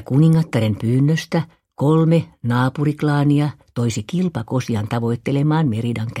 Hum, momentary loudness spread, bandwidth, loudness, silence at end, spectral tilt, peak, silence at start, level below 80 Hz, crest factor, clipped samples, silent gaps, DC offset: none; 8 LU; 12.5 kHz; -19 LUFS; 0 s; -7.5 dB/octave; -4 dBFS; 0 s; -52 dBFS; 14 dB; under 0.1%; none; under 0.1%